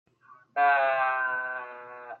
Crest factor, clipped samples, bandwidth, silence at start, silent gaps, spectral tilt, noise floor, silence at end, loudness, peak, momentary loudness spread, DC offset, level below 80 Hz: 14 dB; under 0.1%; 4.5 kHz; 0.55 s; none; -4 dB/octave; -57 dBFS; 0.05 s; -26 LUFS; -14 dBFS; 19 LU; under 0.1%; under -90 dBFS